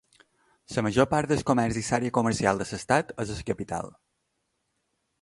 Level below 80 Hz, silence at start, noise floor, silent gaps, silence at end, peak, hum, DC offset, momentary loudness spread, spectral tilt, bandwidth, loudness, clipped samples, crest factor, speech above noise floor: -52 dBFS; 0.7 s; -77 dBFS; none; 1.35 s; -6 dBFS; none; under 0.1%; 10 LU; -5.5 dB/octave; 11.5 kHz; -27 LUFS; under 0.1%; 22 dB; 51 dB